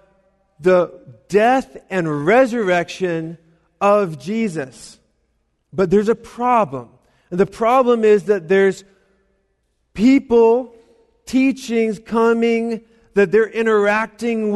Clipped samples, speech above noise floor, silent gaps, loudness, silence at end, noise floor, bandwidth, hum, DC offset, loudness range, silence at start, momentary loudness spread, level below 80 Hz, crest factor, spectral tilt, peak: under 0.1%; 50 dB; none; -17 LUFS; 0 s; -67 dBFS; 12.5 kHz; none; under 0.1%; 4 LU; 0.6 s; 12 LU; -52 dBFS; 14 dB; -6.5 dB/octave; -4 dBFS